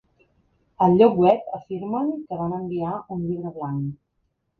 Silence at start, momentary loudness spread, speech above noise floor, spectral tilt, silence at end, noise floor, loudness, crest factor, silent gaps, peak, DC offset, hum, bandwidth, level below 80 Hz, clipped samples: 0.8 s; 14 LU; 51 dB; -10.5 dB/octave; 0.65 s; -73 dBFS; -23 LUFS; 20 dB; none; -4 dBFS; under 0.1%; none; 4.6 kHz; -58 dBFS; under 0.1%